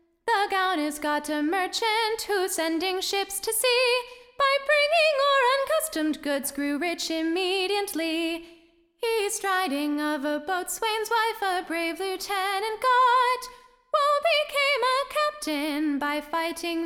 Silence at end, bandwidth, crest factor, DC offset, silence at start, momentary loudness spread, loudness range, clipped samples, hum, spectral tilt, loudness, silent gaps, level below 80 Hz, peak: 0 s; 18 kHz; 14 dB; under 0.1%; 0.25 s; 8 LU; 5 LU; under 0.1%; none; -0.5 dB/octave; -25 LUFS; none; -64 dBFS; -12 dBFS